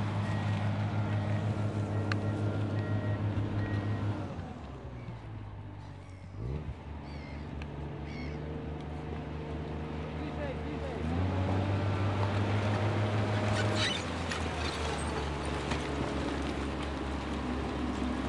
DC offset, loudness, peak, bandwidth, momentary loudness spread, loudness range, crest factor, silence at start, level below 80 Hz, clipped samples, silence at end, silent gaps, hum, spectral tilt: under 0.1%; -34 LUFS; -16 dBFS; 11 kHz; 12 LU; 10 LU; 18 dB; 0 s; -46 dBFS; under 0.1%; 0 s; none; none; -6.5 dB/octave